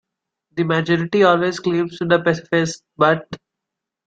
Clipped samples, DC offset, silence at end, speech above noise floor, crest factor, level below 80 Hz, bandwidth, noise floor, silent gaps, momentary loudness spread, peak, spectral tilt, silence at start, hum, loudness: under 0.1%; under 0.1%; 0.7 s; 65 dB; 18 dB; -58 dBFS; 9 kHz; -83 dBFS; none; 10 LU; -2 dBFS; -6 dB/octave; 0.55 s; none; -18 LUFS